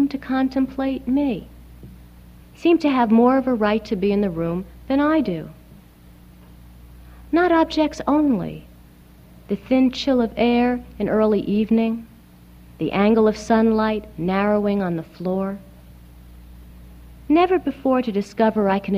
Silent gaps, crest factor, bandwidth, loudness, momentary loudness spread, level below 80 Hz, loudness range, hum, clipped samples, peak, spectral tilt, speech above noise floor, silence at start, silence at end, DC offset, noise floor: none; 16 dB; 15 kHz; -20 LUFS; 9 LU; -46 dBFS; 4 LU; 60 Hz at -45 dBFS; under 0.1%; -4 dBFS; -7 dB/octave; 28 dB; 0 s; 0 s; under 0.1%; -47 dBFS